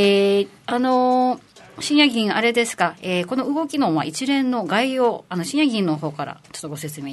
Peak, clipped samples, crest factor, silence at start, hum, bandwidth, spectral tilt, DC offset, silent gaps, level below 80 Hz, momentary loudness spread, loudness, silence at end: -2 dBFS; under 0.1%; 18 dB; 0 s; none; 12.5 kHz; -4.5 dB/octave; under 0.1%; none; -68 dBFS; 14 LU; -20 LUFS; 0 s